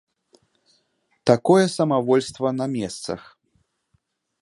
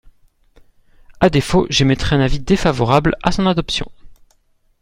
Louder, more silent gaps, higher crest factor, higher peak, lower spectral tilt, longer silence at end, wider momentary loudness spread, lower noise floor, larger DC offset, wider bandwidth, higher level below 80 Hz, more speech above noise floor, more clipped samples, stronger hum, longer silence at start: second, -21 LUFS vs -16 LUFS; neither; first, 22 dB vs 16 dB; about the same, -2 dBFS vs 0 dBFS; about the same, -6 dB/octave vs -5.5 dB/octave; first, 1.2 s vs 0.7 s; first, 14 LU vs 5 LU; first, -69 dBFS vs -58 dBFS; neither; second, 11.5 kHz vs 16 kHz; second, -62 dBFS vs -30 dBFS; first, 49 dB vs 43 dB; neither; neither; about the same, 1.25 s vs 1.2 s